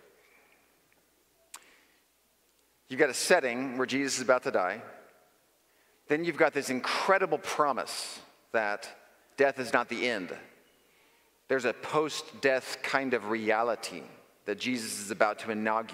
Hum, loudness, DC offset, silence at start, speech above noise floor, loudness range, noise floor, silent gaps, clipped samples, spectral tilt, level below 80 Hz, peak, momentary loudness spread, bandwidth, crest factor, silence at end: none; -30 LUFS; under 0.1%; 1.55 s; 40 dB; 3 LU; -69 dBFS; none; under 0.1%; -3 dB/octave; -82 dBFS; -8 dBFS; 15 LU; 16 kHz; 24 dB; 0 s